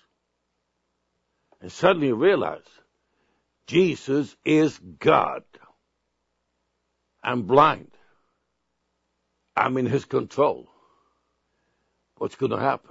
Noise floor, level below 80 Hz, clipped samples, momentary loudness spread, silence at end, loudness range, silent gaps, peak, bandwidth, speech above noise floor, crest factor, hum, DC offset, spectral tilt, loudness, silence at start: -77 dBFS; -66 dBFS; under 0.1%; 14 LU; 0.15 s; 4 LU; none; -2 dBFS; 8 kHz; 54 dB; 24 dB; none; under 0.1%; -6.5 dB/octave; -23 LUFS; 1.65 s